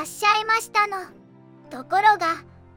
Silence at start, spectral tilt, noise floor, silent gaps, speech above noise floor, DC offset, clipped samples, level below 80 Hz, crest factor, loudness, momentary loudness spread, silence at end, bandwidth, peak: 0 s; -1.5 dB/octave; -48 dBFS; none; 26 dB; under 0.1%; under 0.1%; -68 dBFS; 20 dB; -21 LUFS; 21 LU; 0.35 s; 17 kHz; -4 dBFS